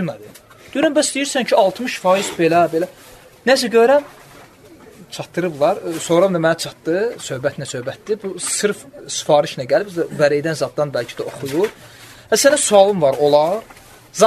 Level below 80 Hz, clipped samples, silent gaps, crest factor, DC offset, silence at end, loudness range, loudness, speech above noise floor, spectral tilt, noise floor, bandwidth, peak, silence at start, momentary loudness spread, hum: -58 dBFS; under 0.1%; none; 18 dB; under 0.1%; 0 s; 4 LU; -17 LUFS; 26 dB; -3.5 dB/octave; -43 dBFS; 13.5 kHz; 0 dBFS; 0 s; 13 LU; none